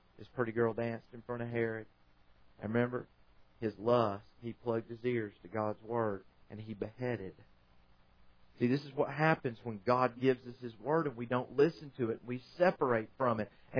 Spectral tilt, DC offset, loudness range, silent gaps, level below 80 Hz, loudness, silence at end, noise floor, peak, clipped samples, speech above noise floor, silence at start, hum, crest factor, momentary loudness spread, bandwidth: -6 dB/octave; under 0.1%; 6 LU; none; -70 dBFS; -35 LUFS; 0 s; -64 dBFS; -14 dBFS; under 0.1%; 29 dB; 0.2 s; none; 22 dB; 14 LU; 5.4 kHz